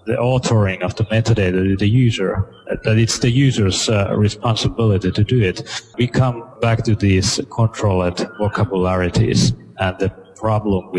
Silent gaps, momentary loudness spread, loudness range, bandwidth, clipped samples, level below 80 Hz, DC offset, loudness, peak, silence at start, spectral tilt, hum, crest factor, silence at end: none; 7 LU; 2 LU; 11 kHz; under 0.1%; -38 dBFS; under 0.1%; -18 LUFS; -2 dBFS; 0.05 s; -5.5 dB/octave; none; 14 dB; 0 s